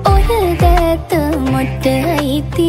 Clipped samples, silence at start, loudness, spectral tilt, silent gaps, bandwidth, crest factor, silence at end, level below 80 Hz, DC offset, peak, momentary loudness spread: under 0.1%; 0 s; -14 LUFS; -6.5 dB/octave; none; 16.5 kHz; 12 dB; 0 s; -18 dBFS; under 0.1%; -2 dBFS; 4 LU